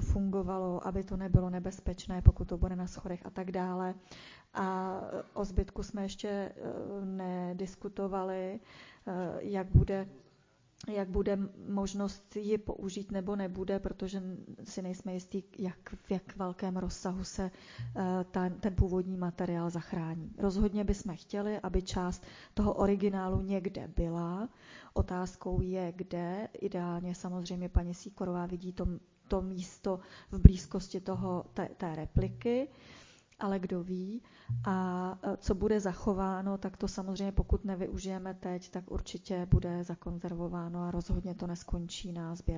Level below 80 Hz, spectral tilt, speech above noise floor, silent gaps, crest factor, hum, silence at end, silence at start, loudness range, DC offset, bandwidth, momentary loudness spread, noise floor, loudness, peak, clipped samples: -40 dBFS; -7.5 dB/octave; 33 dB; none; 32 dB; none; 0 s; 0 s; 7 LU; under 0.1%; 7.6 kHz; 10 LU; -67 dBFS; -35 LUFS; -2 dBFS; under 0.1%